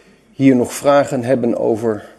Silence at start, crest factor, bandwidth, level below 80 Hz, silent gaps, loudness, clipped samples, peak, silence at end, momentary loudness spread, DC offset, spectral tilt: 0.4 s; 16 dB; 13 kHz; -58 dBFS; none; -15 LUFS; under 0.1%; 0 dBFS; 0.1 s; 4 LU; under 0.1%; -6.5 dB/octave